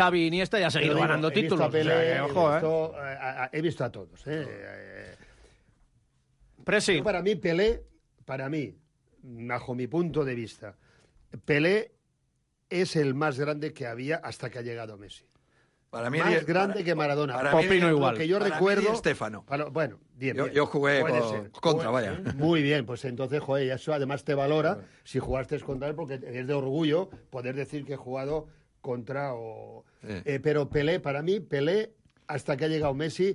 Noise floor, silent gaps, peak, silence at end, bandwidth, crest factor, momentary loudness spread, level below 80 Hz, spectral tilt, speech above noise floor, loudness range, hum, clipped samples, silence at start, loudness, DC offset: -74 dBFS; none; -12 dBFS; 0 s; 11.5 kHz; 16 dB; 14 LU; -54 dBFS; -6 dB/octave; 46 dB; 8 LU; none; under 0.1%; 0 s; -28 LUFS; under 0.1%